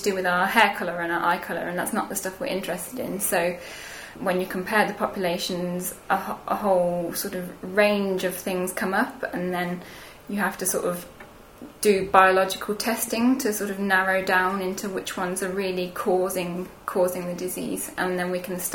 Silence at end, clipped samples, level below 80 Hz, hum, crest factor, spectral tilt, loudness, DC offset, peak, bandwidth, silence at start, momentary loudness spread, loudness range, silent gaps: 0 s; under 0.1%; -56 dBFS; none; 24 dB; -4 dB/octave; -25 LUFS; under 0.1%; 0 dBFS; 19.5 kHz; 0 s; 10 LU; 5 LU; none